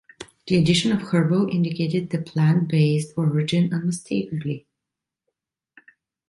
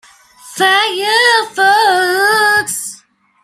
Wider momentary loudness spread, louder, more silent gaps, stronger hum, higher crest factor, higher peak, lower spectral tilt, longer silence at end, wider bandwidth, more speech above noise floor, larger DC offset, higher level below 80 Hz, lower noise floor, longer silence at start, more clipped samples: about the same, 10 LU vs 11 LU; second, -22 LUFS vs -11 LUFS; neither; neither; about the same, 16 dB vs 12 dB; second, -6 dBFS vs 0 dBFS; first, -6.5 dB/octave vs -0.5 dB/octave; first, 1.7 s vs 0.5 s; second, 11.5 kHz vs 16 kHz; first, 65 dB vs 34 dB; neither; first, -56 dBFS vs -62 dBFS; first, -85 dBFS vs -45 dBFS; second, 0.2 s vs 0.45 s; neither